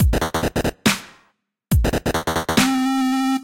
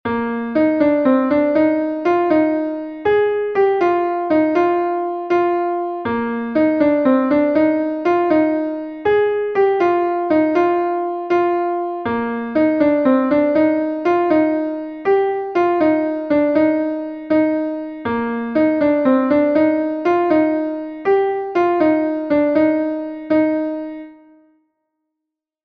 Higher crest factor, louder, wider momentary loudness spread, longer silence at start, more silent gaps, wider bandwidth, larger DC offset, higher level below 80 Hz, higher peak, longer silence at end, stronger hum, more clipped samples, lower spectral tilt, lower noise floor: about the same, 18 dB vs 14 dB; second, -20 LUFS vs -17 LUFS; second, 4 LU vs 7 LU; about the same, 0 s vs 0.05 s; neither; first, 17 kHz vs 5.2 kHz; neither; first, -28 dBFS vs -56 dBFS; about the same, -2 dBFS vs -2 dBFS; second, 0 s vs 1.5 s; neither; neither; second, -4.5 dB/octave vs -8 dB/octave; second, -64 dBFS vs -82 dBFS